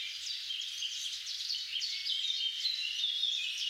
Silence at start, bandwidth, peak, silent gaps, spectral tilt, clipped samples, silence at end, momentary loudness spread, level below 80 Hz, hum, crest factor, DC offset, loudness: 0 s; 16 kHz; -22 dBFS; none; 6 dB/octave; under 0.1%; 0 s; 6 LU; -82 dBFS; none; 14 dB; under 0.1%; -33 LUFS